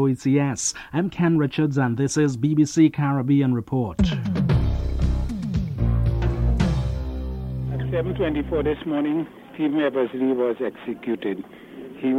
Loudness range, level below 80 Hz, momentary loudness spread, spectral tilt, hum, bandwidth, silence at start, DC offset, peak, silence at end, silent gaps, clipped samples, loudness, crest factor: 4 LU; -30 dBFS; 9 LU; -6.5 dB/octave; none; 11.5 kHz; 0 s; under 0.1%; -6 dBFS; 0 s; none; under 0.1%; -23 LUFS; 16 dB